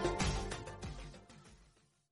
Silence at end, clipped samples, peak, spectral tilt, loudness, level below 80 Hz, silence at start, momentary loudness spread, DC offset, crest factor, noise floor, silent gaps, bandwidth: 0.45 s; under 0.1%; -22 dBFS; -4.5 dB/octave; -41 LUFS; -48 dBFS; 0 s; 23 LU; under 0.1%; 20 dB; -69 dBFS; none; 11.5 kHz